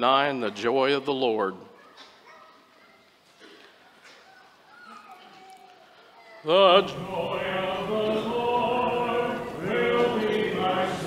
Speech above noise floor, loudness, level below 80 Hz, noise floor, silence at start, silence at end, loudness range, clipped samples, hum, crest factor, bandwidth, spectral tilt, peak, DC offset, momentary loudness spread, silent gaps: 35 dB; -25 LUFS; -62 dBFS; -58 dBFS; 0 s; 0 s; 9 LU; under 0.1%; none; 22 dB; 15.5 kHz; -5 dB/octave; -4 dBFS; under 0.1%; 11 LU; none